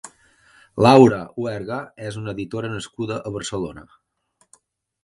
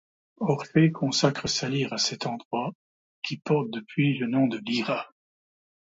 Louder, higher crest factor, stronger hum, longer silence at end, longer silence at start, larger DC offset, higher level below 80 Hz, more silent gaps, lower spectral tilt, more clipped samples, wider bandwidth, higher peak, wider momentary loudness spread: first, -20 LUFS vs -27 LUFS; about the same, 22 dB vs 20 dB; neither; first, 1.2 s vs 0.9 s; second, 0.05 s vs 0.4 s; neither; first, -52 dBFS vs -64 dBFS; second, none vs 2.45-2.51 s, 2.75-3.22 s; first, -6.5 dB/octave vs -5 dB/octave; neither; first, 11.5 kHz vs 7.8 kHz; first, 0 dBFS vs -8 dBFS; first, 18 LU vs 10 LU